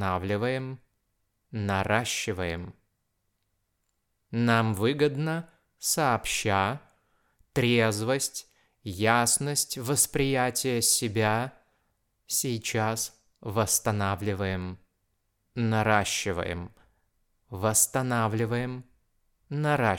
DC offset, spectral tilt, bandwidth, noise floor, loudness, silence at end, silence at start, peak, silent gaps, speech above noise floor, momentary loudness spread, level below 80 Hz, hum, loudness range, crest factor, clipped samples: under 0.1%; -4 dB/octave; 18 kHz; -77 dBFS; -27 LUFS; 0 s; 0 s; -6 dBFS; none; 50 dB; 15 LU; -58 dBFS; none; 5 LU; 22 dB; under 0.1%